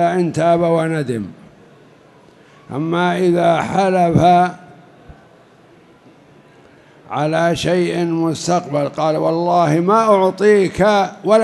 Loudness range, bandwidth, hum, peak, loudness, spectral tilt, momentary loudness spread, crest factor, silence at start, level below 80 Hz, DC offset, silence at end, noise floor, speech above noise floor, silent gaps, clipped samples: 7 LU; 12 kHz; none; 0 dBFS; -16 LUFS; -6.5 dB/octave; 8 LU; 16 dB; 0 s; -50 dBFS; under 0.1%; 0 s; -47 dBFS; 32 dB; none; under 0.1%